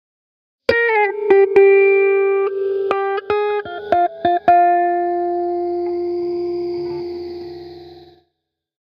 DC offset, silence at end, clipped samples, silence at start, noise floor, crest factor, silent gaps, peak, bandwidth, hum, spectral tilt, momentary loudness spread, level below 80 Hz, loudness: under 0.1%; 0.85 s; under 0.1%; 0.7 s; -76 dBFS; 18 dB; none; 0 dBFS; 5.6 kHz; none; -7 dB/octave; 15 LU; -56 dBFS; -17 LUFS